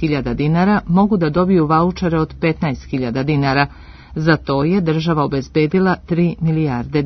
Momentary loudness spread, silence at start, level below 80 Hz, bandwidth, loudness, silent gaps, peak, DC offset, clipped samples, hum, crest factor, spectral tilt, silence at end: 6 LU; 0 s; -38 dBFS; 6.2 kHz; -17 LUFS; none; 0 dBFS; under 0.1%; under 0.1%; none; 16 dB; -8.5 dB/octave; 0 s